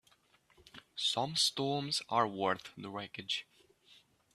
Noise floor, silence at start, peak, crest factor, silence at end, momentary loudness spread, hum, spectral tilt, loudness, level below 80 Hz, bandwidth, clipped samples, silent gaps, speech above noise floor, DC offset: -69 dBFS; 0.75 s; -14 dBFS; 22 dB; 0.4 s; 13 LU; none; -3 dB/octave; -34 LUFS; -76 dBFS; 14.5 kHz; under 0.1%; none; 34 dB; under 0.1%